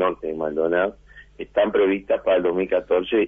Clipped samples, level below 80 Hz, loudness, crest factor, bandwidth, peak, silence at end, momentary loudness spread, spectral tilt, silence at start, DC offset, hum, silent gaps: under 0.1%; -52 dBFS; -22 LUFS; 14 dB; 3.8 kHz; -8 dBFS; 0 s; 7 LU; -8 dB/octave; 0 s; under 0.1%; none; none